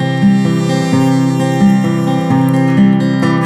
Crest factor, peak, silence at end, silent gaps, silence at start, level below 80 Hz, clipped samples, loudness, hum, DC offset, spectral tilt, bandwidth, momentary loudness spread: 10 dB; -2 dBFS; 0 s; none; 0 s; -46 dBFS; under 0.1%; -12 LUFS; none; under 0.1%; -7 dB/octave; 13.5 kHz; 3 LU